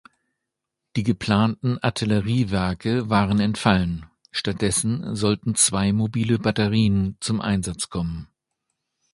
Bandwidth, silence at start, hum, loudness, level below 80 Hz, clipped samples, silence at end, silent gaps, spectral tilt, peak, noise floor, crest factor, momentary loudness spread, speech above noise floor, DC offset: 11.5 kHz; 0.95 s; none; -22 LUFS; -44 dBFS; under 0.1%; 0.9 s; none; -5 dB/octave; 0 dBFS; -83 dBFS; 22 dB; 8 LU; 61 dB; under 0.1%